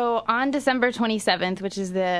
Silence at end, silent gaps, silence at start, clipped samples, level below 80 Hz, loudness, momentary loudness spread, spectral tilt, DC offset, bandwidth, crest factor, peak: 0 s; none; 0 s; under 0.1%; -60 dBFS; -23 LUFS; 5 LU; -4.5 dB/octave; under 0.1%; 11 kHz; 16 dB; -6 dBFS